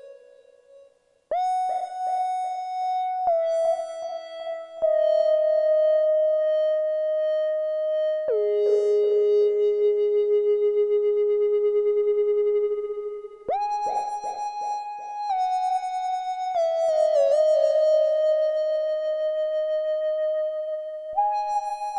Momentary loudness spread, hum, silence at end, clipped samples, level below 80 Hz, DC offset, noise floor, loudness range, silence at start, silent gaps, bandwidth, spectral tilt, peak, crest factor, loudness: 10 LU; none; 0 s; under 0.1%; -72 dBFS; under 0.1%; -58 dBFS; 5 LU; 0.05 s; none; 10 kHz; -3 dB/octave; -10 dBFS; 12 dB; -24 LUFS